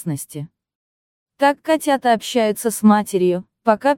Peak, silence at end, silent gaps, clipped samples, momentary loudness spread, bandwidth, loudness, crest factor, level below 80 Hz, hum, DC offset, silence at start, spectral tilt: 0 dBFS; 0 s; 0.75-1.26 s; under 0.1%; 13 LU; 17 kHz; -18 LUFS; 18 dB; -64 dBFS; none; under 0.1%; 0 s; -5 dB/octave